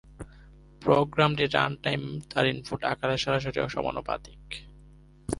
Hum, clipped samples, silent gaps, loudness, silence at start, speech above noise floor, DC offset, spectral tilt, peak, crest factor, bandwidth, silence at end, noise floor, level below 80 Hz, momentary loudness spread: none; under 0.1%; none; -27 LUFS; 0.1 s; 25 dB; under 0.1%; -5.5 dB/octave; -6 dBFS; 22 dB; 11.5 kHz; 0 s; -53 dBFS; -50 dBFS; 17 LU